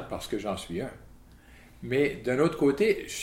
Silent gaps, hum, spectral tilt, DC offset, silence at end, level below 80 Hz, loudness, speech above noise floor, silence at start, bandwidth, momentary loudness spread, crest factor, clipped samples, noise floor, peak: none; none; -5.5 dB/octave; under 0.1%; 0 s; -52 dBFS; -28 LUFS; 25 dB; 0 s; 16.5 kHz; 12 LU; 18 dB; under 0.1%; -53 dBFS; -12 dBFS